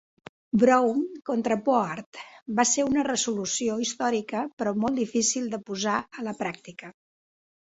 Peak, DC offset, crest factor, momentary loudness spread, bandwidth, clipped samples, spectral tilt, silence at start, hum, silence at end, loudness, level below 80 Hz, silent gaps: -6 dBFS; under 0.1%; 20 dB; 12 LU; 8.4 kHz; under 0.1%; -3.5 dB/octave; 0.55 s; none; 0.75 s; -26 LUFS; -64 dBFS; 2.06-2.12 s, 2.42-2.46 s, 4.53-4.57 s